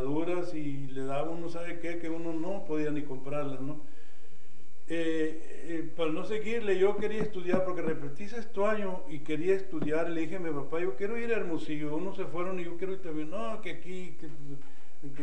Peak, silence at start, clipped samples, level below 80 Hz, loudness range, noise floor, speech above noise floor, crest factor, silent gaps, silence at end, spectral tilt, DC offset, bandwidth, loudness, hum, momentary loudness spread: -14 dBFS; 0 s; under 0.1%; -66 dBFS; 5 LU; -60 dBFS; 26 dB; 20 dB; none; 0 s; -7 dB/octave; 6%; 10 kHz; -34 LUFS; none; 11 LU